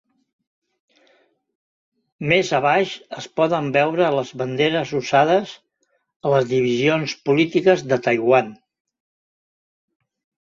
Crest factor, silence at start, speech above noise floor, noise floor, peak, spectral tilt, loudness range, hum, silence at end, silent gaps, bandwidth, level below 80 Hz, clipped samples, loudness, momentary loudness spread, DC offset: 20 dB; 2.2 s; 51 dB; -69 dBFS; -2 dBFS; -5.5 dB/octave; 3 LU; none; 1.9 s; 6.16-6.20 s; 7.6 kHz; -64 dBFS; under 0.1%; -19 LUFS; 10 LU; under 0.1%